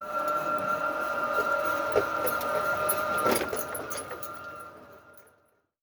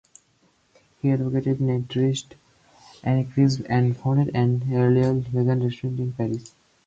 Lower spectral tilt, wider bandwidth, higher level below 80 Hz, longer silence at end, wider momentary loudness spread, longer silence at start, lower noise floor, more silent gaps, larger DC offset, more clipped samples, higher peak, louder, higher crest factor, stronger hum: second, -3 dB/octave vs -8 dB/octave; first, over 20 kHz vs 7.8 kHz; second, -62 dBFS vs -56 dBFS; first, 0.6 s vs 0.4 s; first, 11 LU vs 8 LU; second, 0 s vs 1.05 s; first, -68 dBFS vs -64 dBFS; neither; neither; neither; about the same, -10 dBFS vs -8 dBFS; second, -28 LUFS vs -23 LUFS; about the same, 20 dB vs 16 dB; neither